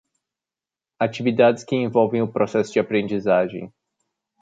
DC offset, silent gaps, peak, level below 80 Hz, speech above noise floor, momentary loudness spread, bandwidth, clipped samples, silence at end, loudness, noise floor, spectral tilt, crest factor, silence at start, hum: under 0.1%; none; -4 dBFS; -64 dBFS; 70 dB; 8 LU; 9 kHz; under 0.1%; 0.75 s; -21 LUFS; -90 dBFS; -6.5 dB/octave; 18 dB; 1 s; none